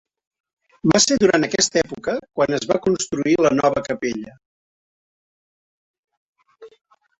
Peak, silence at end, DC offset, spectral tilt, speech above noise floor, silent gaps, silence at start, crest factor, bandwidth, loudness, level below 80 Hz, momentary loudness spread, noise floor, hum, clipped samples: -2 dBFS; 0.5 s; under 0.1%; -3.5 dB/octave; over 71 dB; 4.46-6.03 s, 6.17-6.33 s; 0.85 s; 20 dB; 8.4 kHz; -19 LUFS; -54 dBFS; 10 LU; under -90 dBFS; none; under 0.1%